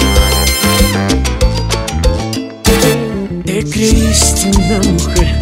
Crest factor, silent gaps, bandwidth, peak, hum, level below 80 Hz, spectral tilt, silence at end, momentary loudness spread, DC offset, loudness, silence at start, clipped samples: 12 dB; none; 16.5 kHz; 0 dBFS; none; -16 dBFS; -4 dB/octave; 0 s; 7 LU; under 0.1%; -12 LUFS; 0 s; under 0.1%